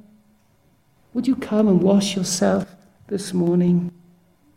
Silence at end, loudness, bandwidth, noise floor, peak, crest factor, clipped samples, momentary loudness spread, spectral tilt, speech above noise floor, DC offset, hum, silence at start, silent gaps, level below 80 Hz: 0.65 s; -20 LUFS; 14 kHz; -59 dBFS; -6 dBFS; 16 dB; under 0.1%; 13 LU; -6 dB/octave; 40 dB; under 0.1%; none; 1.15 s; none; -58 dBFS